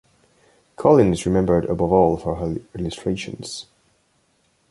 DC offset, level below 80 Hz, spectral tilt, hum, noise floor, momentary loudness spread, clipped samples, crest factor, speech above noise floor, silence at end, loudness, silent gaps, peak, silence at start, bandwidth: under 0.1%; -42 dBFS; -7 dB/octave; none; -64 dBFS; 15 LU; under 0.1%; 20 dB; 45 dB; 1.1 s; -20 LUFS; none; -2 dBFS; 0.8 s; 11.5 kHz